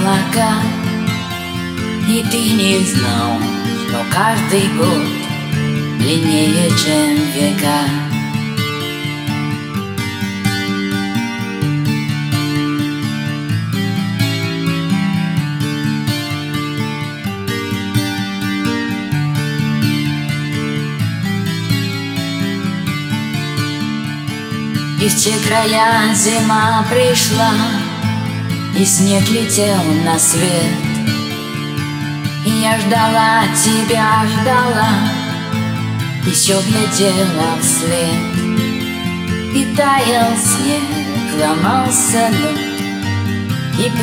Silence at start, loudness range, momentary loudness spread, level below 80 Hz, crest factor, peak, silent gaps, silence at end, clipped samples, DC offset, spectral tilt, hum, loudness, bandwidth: 0 s; 6 LU; 8 LU; -50 dBFS; 16 dB; 0 dBFS; none; 0 s; under 0.1%; under 0.1%; -4 dB/octave; none; -15 LUFS; 17 kHz